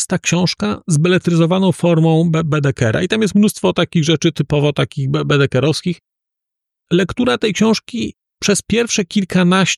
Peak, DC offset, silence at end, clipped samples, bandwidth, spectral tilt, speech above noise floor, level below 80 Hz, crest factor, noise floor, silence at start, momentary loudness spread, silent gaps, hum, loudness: -4 dBFS; under 0.1%; 0 s; under 0.1%; 13 kHz; -5.5 dB/octave; 68 dB; -46 dBFS; 12 dB; -82 dBFS; 0 s; 6 LU; none; none; -15 LUFS